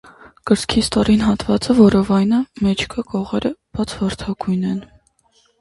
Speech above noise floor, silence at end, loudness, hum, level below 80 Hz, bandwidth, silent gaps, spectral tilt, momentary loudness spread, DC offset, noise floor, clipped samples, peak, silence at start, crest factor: 42 dB; 0.75 s; -18 LUFS; none; -40 dBFS; 11.5 kHz; none; -6 dB/octave; 12 LU; under 0.1%; -59 dBFS; under 0.1%; 0 dBFS; 0.45 s; 18 dB